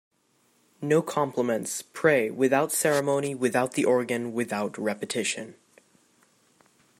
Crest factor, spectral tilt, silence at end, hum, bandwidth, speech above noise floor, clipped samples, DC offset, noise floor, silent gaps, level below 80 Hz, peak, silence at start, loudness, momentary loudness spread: 20 dB; -4 dB/octave; 1.5 s; none; 16 kHz; 42 dB; under 0.1%; under 0.1%; -67 dBFS; none; -74 dBFS; -8 dBFS; 0.8 s; -26 LUFS; 7 LU